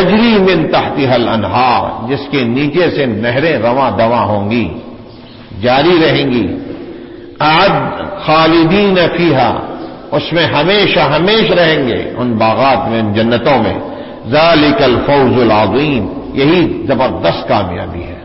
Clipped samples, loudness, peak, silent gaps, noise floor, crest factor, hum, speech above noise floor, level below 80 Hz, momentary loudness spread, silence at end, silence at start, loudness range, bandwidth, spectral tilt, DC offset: under 0.1%; -11 LUFS; 0 dBFS; none; -33 dBFS; 12 dB; none; 22 dB; -36 dBFS; 11 LU; 0 s; 0 s; 3 LU; 5.8 kHz; -9.5 dB/octave; under 0.1%